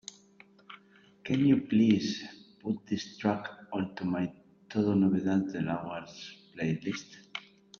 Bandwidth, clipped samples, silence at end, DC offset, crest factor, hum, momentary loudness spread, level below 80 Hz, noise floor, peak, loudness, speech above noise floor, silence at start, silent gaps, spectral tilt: 7.6 kHz; under 0.1%; 0.4 s; under 0.1%; 20 dB; none; 20 LU; -70 dBFS; -60 dBFS; -10 dBFS; -31 LUFS; 31 dB; 0.7 s; none; -6.5 dB/octave